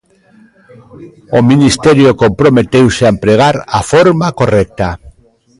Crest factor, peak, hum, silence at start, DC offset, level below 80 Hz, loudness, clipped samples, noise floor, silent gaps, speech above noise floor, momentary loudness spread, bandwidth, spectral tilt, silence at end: 10 dB; 0 dBFS; none; 0.95 s; under 0.1%; -34 dBFS; -9 LUFS; under 0.1%; -45 dBFS; none; 36 dB; 7 LU; 11.5 kHz; -6 dB/octave; 0.5 s